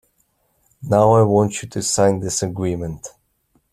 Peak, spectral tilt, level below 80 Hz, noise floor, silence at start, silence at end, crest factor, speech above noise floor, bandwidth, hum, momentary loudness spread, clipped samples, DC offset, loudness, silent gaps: -2 dBFS; -5.5 dB/octave; -50 dBFS; -65 dBFS; 0.8 s; 0.65 s; 18 dB; 47 dB; 14.5 kHz; none; 19 LU; under 0.1%; under 0.1%; -18 LUFS; none